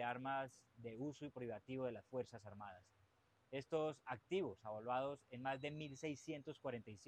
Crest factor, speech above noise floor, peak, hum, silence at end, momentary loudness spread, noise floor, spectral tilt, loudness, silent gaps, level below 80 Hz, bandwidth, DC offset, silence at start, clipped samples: 18 dB; 30 dB; -30 dBFS; none; 0 s; 11 LU; -77 dBFS; -6 dB/octave; -48 LUFS; none; -82 dBFS; 11 kHz; under 0.1%; 0 s; under 0.1%